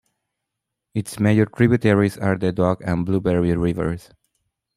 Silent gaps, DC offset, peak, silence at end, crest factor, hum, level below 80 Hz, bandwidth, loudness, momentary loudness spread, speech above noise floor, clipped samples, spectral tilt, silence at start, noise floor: none; under 0.1%; -2 dBFS; 0.8 s; 18 dB; none; -46 dBFS; 14.5 kHz; -20 LUFS; 11 LU; 62 dB; under 0.1%; -7.5 dB/octave; 0.95 s; -82 dBFS